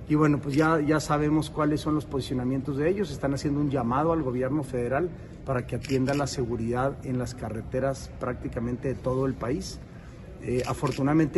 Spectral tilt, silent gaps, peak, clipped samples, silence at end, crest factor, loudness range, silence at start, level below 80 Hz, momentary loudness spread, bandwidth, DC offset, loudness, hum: -7 dB/octave; none; -10 dBFS; under 0.1%; 0 s; 16 dB; 5 LU; 0 s; -44 dBFS; 10 LU; 12 kHz; under 0.1%; -28 LUFS; none